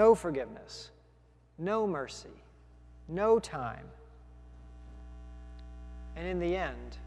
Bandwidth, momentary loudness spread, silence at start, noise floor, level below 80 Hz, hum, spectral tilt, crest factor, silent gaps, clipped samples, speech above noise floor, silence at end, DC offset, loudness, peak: 11.5 kHz; 25 LU; 0 s; -62 dBFS; -50 dBFS; none; -6 dB/octave; 22 dB; none; under 0.1%; 31 dB; 0 s; under 0.1%; -33 LUFS; -12 dBFS